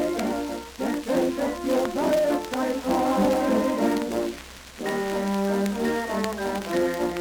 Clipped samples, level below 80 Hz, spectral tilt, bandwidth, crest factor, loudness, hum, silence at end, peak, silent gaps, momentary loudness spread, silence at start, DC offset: under 0.1%; -50 dBFS; -5 dB/octave; over 20 kHz; 16 dB; -25 LUFS; none; 0 s; -8 dBFS; none; 8 LU; 0 s; under 0.1%